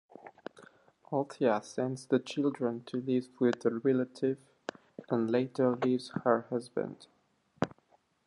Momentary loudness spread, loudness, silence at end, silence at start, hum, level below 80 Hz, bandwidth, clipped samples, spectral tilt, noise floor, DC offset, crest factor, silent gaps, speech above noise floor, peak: 16 LU; -32 LUFS; 0.6 s; 0.25 s; none; -76 dBFS; 11 kHz; under 0.1%; -7 dB/octave; -69 dBFS; under 0.1%; 22 dB; none; 38 dB; -12 dBFS